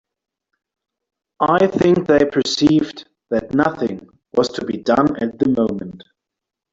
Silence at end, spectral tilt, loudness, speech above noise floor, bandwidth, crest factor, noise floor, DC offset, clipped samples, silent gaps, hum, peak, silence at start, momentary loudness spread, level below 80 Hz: 0.75 s; -6 dB/octave; -18 LUFS; 67 dB; 7.8 kHz; 18 dB; -83 dBFS; under 0.1%; under 0.1%; none; none; -2 dBFS; 1.4 s; 11 LU; -52 dBFS